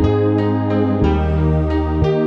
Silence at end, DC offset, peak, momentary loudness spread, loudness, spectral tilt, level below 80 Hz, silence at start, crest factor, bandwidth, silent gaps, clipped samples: 0 s; under 0.1%; -4 dBFS; 2 LU; -17 LUFS; -9.5 dB/octave; -24 dBFS; 0 s; 12 dB; 6.2 kHz; none; under 0.1%